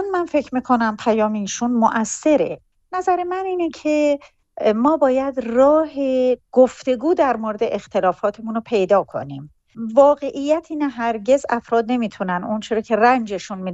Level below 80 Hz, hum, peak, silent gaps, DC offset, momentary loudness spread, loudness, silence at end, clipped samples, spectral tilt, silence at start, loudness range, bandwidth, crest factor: -56 dBFS; none; -4 dBFS; none; under 0.1%; 8 LU; -19 LUFS; 0 s; under 0.1%; -5 dB/octave; 0 s; 3 LU; 8.4 kHz; 16 dB